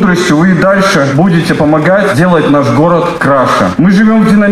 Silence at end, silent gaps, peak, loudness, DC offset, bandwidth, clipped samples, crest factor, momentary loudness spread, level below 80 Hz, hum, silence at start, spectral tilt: 0 s; none; 0 dBFS; -8 LUFS; under 0.1%; 13.5 kHz; under 0.1%; 6 dB; 2 LU; -36 dBFS; none; 0 s; -6.5 dB/octave